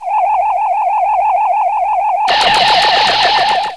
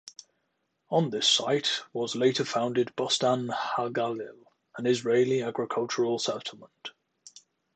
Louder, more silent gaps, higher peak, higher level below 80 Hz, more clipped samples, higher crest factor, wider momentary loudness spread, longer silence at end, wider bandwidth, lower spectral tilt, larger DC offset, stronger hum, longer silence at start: first, -12 LUFS vs -27 LUFS; neither; first, 0 dBFS vs -10 dBFS; first, -46 dBFS vs -76 dBFS; neither; second, 12 dB vs 20 dB; second, 5 LU vs 19 LU; second, 0 s vs 0.45 s; first, 11 kHz vs 9.2 kHz; second, -1 dB/octave vs -4 dB/octave; first, 0.4% vs under 0.1%; neither; about the same, 0 s vs 0.05 s